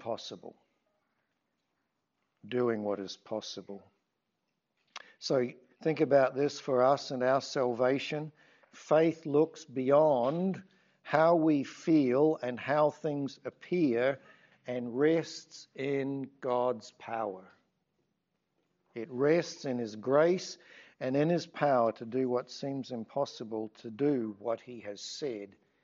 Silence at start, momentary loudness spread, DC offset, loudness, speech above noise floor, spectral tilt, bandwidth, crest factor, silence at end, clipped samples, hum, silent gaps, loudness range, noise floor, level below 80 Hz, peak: 0 s; 17 LU; under 0.1%; -31 LUFS; 52 dB; -5 dB/octave; 7.6 kHz; 22 dB; 0.35 s; under 0.1%; none; none; 10 LU; -83 dBFS; -84 dBFS; -10 dBFS